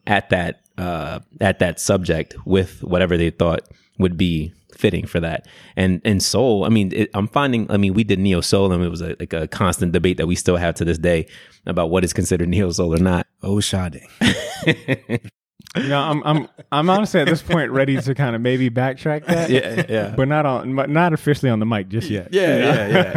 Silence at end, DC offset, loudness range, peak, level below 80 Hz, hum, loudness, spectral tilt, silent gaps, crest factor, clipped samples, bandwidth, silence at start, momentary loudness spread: 0 s; under 0.1%; 2 LU; -2 dBFS; -40 dBFS; none; -19 LUFS; -5.5 dB/octave; none; 18 dB; under 0.1%; 15.5 kHz; 0.05 s; 8 LU